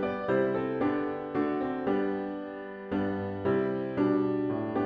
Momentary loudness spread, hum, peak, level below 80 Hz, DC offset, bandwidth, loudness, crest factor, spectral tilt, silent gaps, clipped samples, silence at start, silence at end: 7 LU; none; -16 dBFS; -62 dBFS; under 0.1%; 5.2 kHz; -30 LUFS; 14 dB; -9.5 dB/octave; none; under 0.1%; 0 s; 0 s